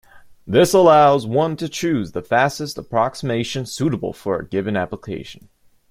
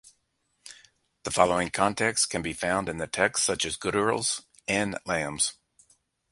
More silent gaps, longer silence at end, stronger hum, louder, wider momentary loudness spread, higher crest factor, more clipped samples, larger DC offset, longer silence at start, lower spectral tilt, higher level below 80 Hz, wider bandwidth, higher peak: neither; second, 0.55 s vs 0.8 s; neither; first, -18 LUFS vs -26 LUFS; first, 15 LU vs 8 LU; second, 16 dB vs 24 dB; neither; neither; second, 0.15 s vs 0.65 s; first, -5.5 dB/octave vs -2.5 dB/octave; about the same, -52 dBFS vs -56 dBFS; first, 16 kHz vs 11.5 kHz; first, -2 dBFS vs -6 dBFS